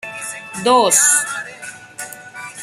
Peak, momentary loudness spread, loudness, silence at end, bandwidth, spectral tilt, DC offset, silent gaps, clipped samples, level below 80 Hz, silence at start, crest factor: 0 dBFS; 21 LU; -13 LUFS; 0 s; 15.5 kHz; -0.5 dB/octave; under 0.1%; none; under 0.1%; -66 dBFS; 0.05 s; 18 dB